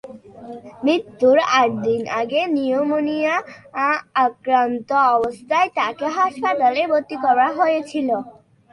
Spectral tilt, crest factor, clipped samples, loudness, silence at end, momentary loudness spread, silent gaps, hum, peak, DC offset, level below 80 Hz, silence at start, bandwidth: -4.5 dB/octave; 14 dB; under 0.1%; -19 LUFS; 0.4 s; 7 LU; none; none; -4 dBFS; under 0.1%; -64 dBFS; 0.05 s; 11 kHz